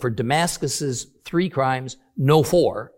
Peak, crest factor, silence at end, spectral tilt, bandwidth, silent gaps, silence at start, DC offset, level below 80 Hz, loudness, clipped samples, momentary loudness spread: -2 dBFS; 18 dB; 0.1 s; -5 dB/octave; 17 kHz; none; 0 s; under 0.1%; -50 dBFS; -21 LUFS; under 0.1%; 11 LU